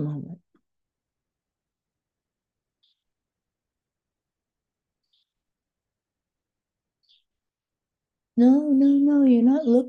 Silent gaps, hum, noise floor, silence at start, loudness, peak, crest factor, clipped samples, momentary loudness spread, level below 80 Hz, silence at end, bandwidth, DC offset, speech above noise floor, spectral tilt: none; none; -89 dBFS; 0 s; -19 LUFS; -8 dBFS; 18 dB; under 0.1%; 15 LU; -80 dBFS; 0 s; 4.8 kHz; under 0.1%; 71 dB; -9.5 dB/octave